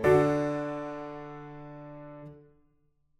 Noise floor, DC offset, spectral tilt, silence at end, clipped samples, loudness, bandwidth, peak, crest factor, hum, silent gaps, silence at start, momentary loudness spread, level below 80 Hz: -69 dBFS; under 0.1%; -7.5 dB/octave; 0.8 s; under 0.1%; -30 LUFS; 15 kHz; -10 dBFS; 20 dB; none; none; 0 s; 22 LU; -56 dBFS